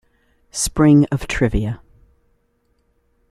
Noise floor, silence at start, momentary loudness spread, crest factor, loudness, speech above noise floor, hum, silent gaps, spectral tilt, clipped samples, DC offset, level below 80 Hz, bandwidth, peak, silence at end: -64 dBFS; 0.55 s; 16 LU; 18 dB; -17 LUFS; 48 dB; none; none; -5.5 dB/octave; under 0.1%; under 0.1%; -34 dBFS; 14.5 kHz; -2 dBFS; 1.55 s